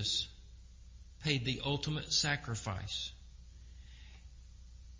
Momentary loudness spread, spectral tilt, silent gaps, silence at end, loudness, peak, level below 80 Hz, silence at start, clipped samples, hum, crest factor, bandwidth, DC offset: 25 LU; -3 dB/octave; none; 0 s; -35 LUFS; -16 dBFS; -54 dBFS; 0 s; under 0.1%; none; 24 dB; 7.6 kHz; under 0.1%